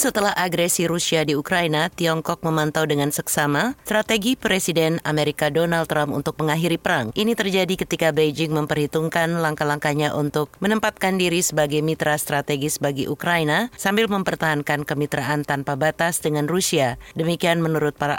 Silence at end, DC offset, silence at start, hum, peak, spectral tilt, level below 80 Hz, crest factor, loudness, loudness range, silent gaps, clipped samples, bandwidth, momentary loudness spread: 0 s; under 0.1%; 0 s; none; -6 dBFS; -4 dB/octave; -52 dBFS; 14 dB; -21 LUFS; 1 LU; none; under 0.1%; 17 kHz; 4 LU